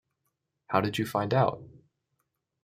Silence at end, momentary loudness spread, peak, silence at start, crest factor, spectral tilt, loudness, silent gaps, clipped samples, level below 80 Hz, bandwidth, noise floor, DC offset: 0.85 s; 4 LU; -8 dBFS; 0.7 s; 24 dB; -6.5 dB/octave; -28 LUFS; none; under 0.1%; -66 dBFS; 16 kHz; -81 dBFS; under 0.1%